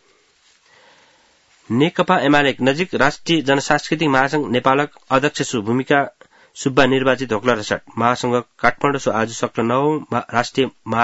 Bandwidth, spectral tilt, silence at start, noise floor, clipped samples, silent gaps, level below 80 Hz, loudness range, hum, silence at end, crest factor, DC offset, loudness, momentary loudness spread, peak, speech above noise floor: 8 kHz; -5 dB/octave; 1.7 s; -57 dBFS; under 0.1%; none; -50 dBFS; 2 LU; none; 0 s; 18 dB; under 0.1%; -18 LUFS; 6 LU; 0 dBFS; 39 dB